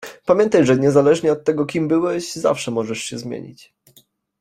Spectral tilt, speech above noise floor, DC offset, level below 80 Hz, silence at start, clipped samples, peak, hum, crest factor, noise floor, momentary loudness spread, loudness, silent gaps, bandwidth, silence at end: -5.5 dB/octave; 38 dB; under 0.1%; -58 dBFS; 0 s; under 0.1%; -2 dBFS; none; 16 dB; -55 dBFS; 13 LU; -18 LUFS; none; 15 kHz; 0.85 s